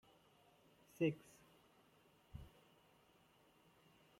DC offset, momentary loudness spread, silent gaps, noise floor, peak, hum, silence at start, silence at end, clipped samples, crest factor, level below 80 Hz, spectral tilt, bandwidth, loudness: under 0.1%; 23 LU; none; -72 dBFS; -26 dBFS; none; 1 s; 1.75 s; under 0.1%; 24 dB; -72 dBFS; -7 dB/octave; 16 kHz; -43 LUFS